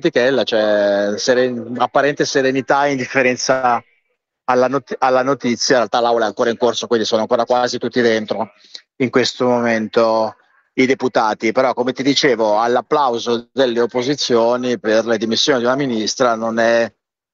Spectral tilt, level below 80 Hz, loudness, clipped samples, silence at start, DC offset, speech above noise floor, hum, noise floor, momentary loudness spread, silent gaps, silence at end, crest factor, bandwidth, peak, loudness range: -4 dB/octave; -62 dBFS; -16 LUFS; under 0.1%; 0.05 s; under 0.1%; 53 dB; none; -69 dBFS; 4 LU; none; 0.45 s; 16 dB; 7.8 kHz; 0 dBFS; 2 LU